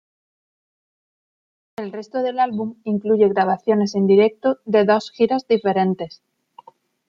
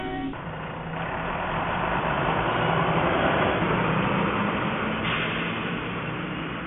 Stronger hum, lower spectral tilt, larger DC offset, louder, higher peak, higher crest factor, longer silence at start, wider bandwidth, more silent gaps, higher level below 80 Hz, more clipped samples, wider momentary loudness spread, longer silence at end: neither; second, -7 dB/octave vs -10.5 dB/octave; neither; first, -19 LUFS vs -26 LUFS; first, -4 dBFS vs -10 dBFS; about the same, 18 dB vs 16 dB; first, 1.8 s vs 0 s; first, 7.4 kHz vs 3.9 kHz; neither; second, -68 dBFS vs -44 dBFS; neither; first, 14 LU vs 9 LU; first, 1 s vs 0 s